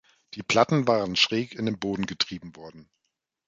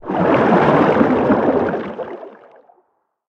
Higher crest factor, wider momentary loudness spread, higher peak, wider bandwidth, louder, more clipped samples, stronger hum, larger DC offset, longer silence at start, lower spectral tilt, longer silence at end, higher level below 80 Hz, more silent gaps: first, 22 dB vs 16 dB; first, 20 LU vs 16 LU; second, -6 dBFS vs 0 dBFS; first, 9.2 kHz vs 7.8 kHz; second, -25 LUFS vs -15 LUFS; neither; neither; neither; first, 0.35 s vs 0.05 s; second, -4.5 dB/octave vs -8.5 dB/octave; second, 0.65 s vs 1 s; second, -60 dBFS vs -50 dBFS; neither